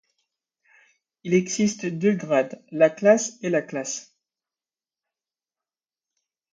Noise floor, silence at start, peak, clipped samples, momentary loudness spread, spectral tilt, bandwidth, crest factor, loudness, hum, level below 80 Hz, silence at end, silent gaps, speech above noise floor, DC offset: under -90 dBFS; 1.25 s; -4 dBFS; under 0.1%; 12 LU; -5 dB/octave; 9.4 kHz; 22 dB; -23 LUFS; none; -70 dBFS; 2.5 s; none; over 68 dB; under 0.1%